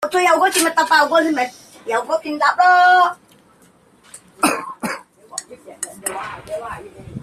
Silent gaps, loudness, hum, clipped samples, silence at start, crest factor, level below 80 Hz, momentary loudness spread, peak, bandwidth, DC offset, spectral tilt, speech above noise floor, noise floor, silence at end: none; -16 LUFS; none; under 0.1%; 0 s; 16 dB; -58 dBFS; 19 LU; -2 dBFS; 15 kHz; under 0.1%; -2 dB/octave; 36 dB; -52 dBFS; 0.05 s